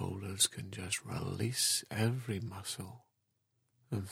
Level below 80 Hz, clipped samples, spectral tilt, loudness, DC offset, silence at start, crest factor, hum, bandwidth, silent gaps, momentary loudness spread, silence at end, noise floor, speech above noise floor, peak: -68 dBFS; under 0.1%; -3 dB/octave; -35 LUFS; under 0.1%; 0 s; 22 dB; none; 16.5 kHz; none; 12 LU; 0 s; -81 dBFS; 45 dB; -16 dBFS